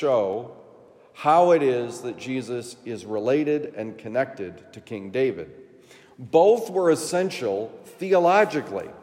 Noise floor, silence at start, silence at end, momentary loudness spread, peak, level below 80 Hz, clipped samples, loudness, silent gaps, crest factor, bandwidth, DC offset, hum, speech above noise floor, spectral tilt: -51 dBFS; 0 s; 0 s; 18 LU; -6 dBFS; -74 dBFS; under 0.1%; -23 LUFS; none; 18 dB; 16 kHz; under 0.1%; none; 28 dB; -5.5 dB/octave